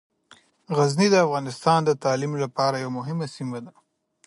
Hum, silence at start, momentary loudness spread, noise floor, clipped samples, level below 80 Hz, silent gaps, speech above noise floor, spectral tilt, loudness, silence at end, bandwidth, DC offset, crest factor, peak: none; 0.7 s; 12 LU; -56 dBFS; under 0.1%; -70 dBFS; none; 34 dB; -5.5 dB/octave; -23 LUFS; 0.55 s; 11.5 kHz; under 0.1%; 20 dB; -4 dBFS